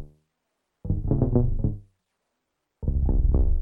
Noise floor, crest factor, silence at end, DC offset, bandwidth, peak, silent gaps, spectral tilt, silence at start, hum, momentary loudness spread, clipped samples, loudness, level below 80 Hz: -79 dBFS; 18 dB; 0 s; under 0.1%; 1.6 kHz; -8 dBFS; none; -14 dB/octave; 0 s; none; 11 LU; under 0.1%; -26 LUFS; -26 dBFS